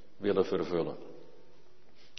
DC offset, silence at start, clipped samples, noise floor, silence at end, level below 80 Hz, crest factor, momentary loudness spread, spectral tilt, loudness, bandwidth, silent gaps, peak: 0.6%; 0.2 s; under 0.1%; -63 dBFS; 0.95 s; -68 dBFS; 20 dB; 18 LU; -5.5 dB/octave; -32 LUFS; 6.2 kHz; none; -14 dBFS